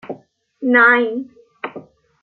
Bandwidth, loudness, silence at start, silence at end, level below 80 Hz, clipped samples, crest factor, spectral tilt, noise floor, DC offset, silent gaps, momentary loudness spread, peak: 4.4 kHz; -14 LUFS; 0.05 s; 0.4 s; -70 dBFS; under 0.1%; 18 dB; -7 dB/octave; -45 dBFS; under 0.1%; none; 24 LU; -2 dBFS